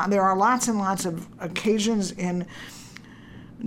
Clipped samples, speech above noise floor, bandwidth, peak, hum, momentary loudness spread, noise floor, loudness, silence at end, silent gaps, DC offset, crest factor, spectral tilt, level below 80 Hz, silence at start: under 0.1%; 20 dB; 16.5 kHz; -8 dBFS; none; 24 LU; -45 dBFS; -24 LUFS; 0 s; none; under 0.1%; 18 dB; -4.5 dB/octave; -58 dBFS; 0 s